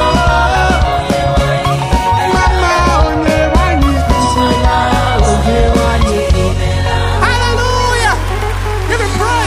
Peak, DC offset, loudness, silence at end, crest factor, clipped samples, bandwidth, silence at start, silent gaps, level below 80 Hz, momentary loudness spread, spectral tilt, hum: 0 dBFS; under 0.1%; -12 LUFS; 0 s; 10 dB; under 0.1%; 15.5 kHz; 0 s; none; -16 dBFS; 3 LU; -5 dB/octave; none